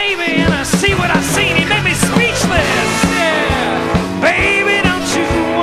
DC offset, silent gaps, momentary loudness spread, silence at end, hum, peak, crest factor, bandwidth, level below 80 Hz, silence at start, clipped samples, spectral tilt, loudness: under 0.1%; none; 4 LU; 0 s; none; 0 dBFS; 14 dB; 14 kHz; -30 dBFS; 0 s; under 0.1%; -4 dB/octave; -13 LUFS